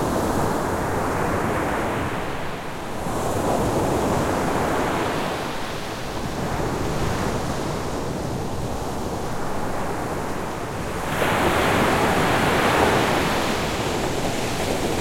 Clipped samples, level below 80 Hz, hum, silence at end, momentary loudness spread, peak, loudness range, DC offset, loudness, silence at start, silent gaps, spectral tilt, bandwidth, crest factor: under 0.1%; -38 dBFS; none; 0 s; 9 LU; -4 dBFS; 7 LU; under 0.1%; -23 LUFS; 0 s; none; -5 dB/octave; 16.5 kHz; 18 dB